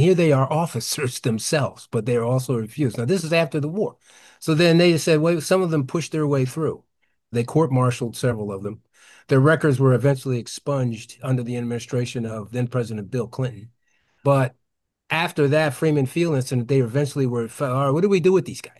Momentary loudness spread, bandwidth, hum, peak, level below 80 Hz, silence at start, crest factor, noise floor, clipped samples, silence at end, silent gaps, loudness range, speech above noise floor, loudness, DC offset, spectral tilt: 10 LU; 12.5 kHz; none; -6 dBFS; -62 dBFS; 0 s; 14 dB; -74 dBFS; under 0.1%; 0.1 s; none; 5 LU; 53 dB; -22 LUFS; under 0.1%; -6 dB/octave